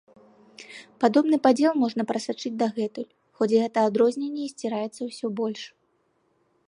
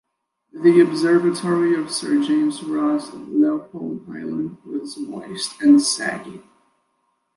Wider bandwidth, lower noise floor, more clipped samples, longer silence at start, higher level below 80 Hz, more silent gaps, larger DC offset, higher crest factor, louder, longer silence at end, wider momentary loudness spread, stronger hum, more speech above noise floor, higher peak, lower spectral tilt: about the same, 11.5 kHz vs 11.5 kHz; about the same, -69 dBFS vs -70 dBFS; neither; about the same, 0.6 s vs 0.55 s; second, -78 dBFS vs -68 dBFS; neither; neither; about the same, 20 dB vs 16 dB; second, -25 LUFS vs -19 LUFS; about the same, 1 s vs 0.95 s; about the same, 18 LU vs 16 LU; neither; second, 45 dB vs 51 dB; about the same, -6 dBFS vs -4 dBFS; about the same, -5.5 dB/octave vs -4.5 dB/octave